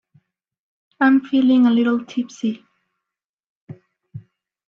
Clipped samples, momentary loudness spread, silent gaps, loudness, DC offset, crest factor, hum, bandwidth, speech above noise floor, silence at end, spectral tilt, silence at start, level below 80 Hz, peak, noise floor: under 0.1%; 12 LU; 3.25-3.38 s, 3.46-3.68 s; -18 LUFS; under 0.1%; 16 dB; none; 7 kHz; 69 dB; 0.5 s; -6 dB/octave; 1 s; -68 dBFS; -4 dBFS; -86 dBFS